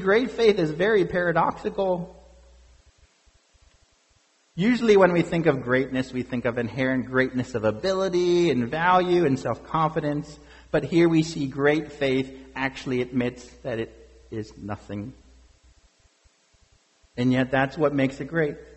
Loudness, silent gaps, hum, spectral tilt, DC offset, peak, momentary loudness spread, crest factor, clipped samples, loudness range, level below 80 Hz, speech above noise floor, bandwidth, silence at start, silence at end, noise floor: -24 LUFS; none; none; -6.5 dB/octave; under 0.1%; -4 dBFS; 15 LU; 20 dB; under 0.1%; 10 LU; -52 dBFS; 40 dB; 8.2 kHz; 0 s; 0.1 s; -64 dBFS